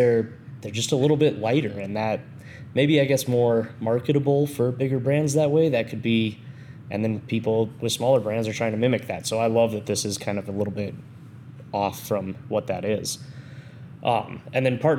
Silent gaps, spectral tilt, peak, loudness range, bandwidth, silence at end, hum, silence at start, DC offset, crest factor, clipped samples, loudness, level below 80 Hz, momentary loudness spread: none; -5.5 dB/octave; -6 dBFS; 6 LU; 17.5 kHz; 0 s; none; 0 s; under 0.1%; 16 dB; under 0.1%; -24 LUFS; -66 dBFS; 19 LU